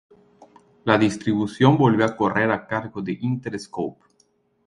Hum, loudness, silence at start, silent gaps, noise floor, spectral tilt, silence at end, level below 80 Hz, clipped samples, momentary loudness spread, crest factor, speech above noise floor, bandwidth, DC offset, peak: none; -22 LUFS; 0.85 s; none; -64 dBFS; -7 dB/octave; 0.75 s; -58 dBFS; under 0.1%; 13 LU; 22 dB; 43 dB; 11 kHz; under 0.1%; 0 dBFS